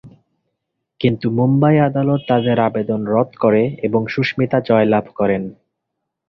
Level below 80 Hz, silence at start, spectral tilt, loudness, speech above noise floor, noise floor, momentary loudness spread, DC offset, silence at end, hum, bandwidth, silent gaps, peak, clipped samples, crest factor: -52 dBFS; 0.05 s; -9.5 dB/octave; -17 LUFS; 62 dB; -78 dBFS; 6 LU; under 0.1%; 0.75 s; none; 6 kHz; none; -2 dBFS; under 0.1%; 16 dB